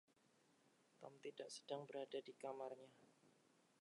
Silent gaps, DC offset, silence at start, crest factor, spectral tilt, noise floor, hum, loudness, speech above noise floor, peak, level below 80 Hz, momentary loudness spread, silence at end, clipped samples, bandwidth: none; under 0.1%; 0.5 s; 22 dB; -4 dB/octave; -78 dBFS; none; -54 LUFS; 25 dB; -34 dBFS; under -90 dBFS; 12 LU; 0.5 s; under 0.1%; 11 kHz